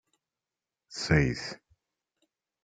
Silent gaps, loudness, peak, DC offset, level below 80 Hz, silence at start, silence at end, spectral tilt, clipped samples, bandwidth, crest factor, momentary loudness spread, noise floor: none; -28 LUFS; -10 dBFS; under 0.1%; -48 dBFS; 0.9 s; 1.1 s; -5.5 dB/octave; under 0.1%; 9.2 kHz; 24 dB; 18 LU; under -90 dBFS